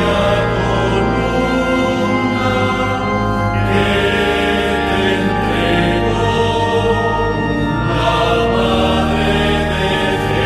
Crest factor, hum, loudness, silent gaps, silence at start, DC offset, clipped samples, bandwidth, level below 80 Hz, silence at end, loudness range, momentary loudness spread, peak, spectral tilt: 12 dB; none; -15 LUFS; none; 0 s; 0.1%; under 0.1%; 14 kHz; -28 dBFS; 0 s; 1 LU; 3 LU; -2 dBFS; -6 dB/octave